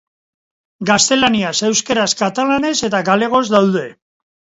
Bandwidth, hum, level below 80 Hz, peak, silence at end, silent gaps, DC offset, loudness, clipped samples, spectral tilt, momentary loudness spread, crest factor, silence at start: 8 kHz; none; -54 dBFS; 0 dBFS; 0.65 s; none; under 0.1%; -15 LUFS; under 0.1%; -3 dB/octave; 5 LU; 16 dB; 0.8 s